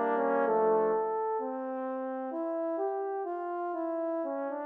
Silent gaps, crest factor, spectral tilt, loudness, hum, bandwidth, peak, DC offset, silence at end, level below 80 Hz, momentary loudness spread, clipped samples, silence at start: none; 14 dB; -9 dB/octave; -32 LUFS; none; 3.5 kHz; -16 dBFS; under 0.1%; 0 s; -86 dBFS; 9 LU; under 0.1%; 0 s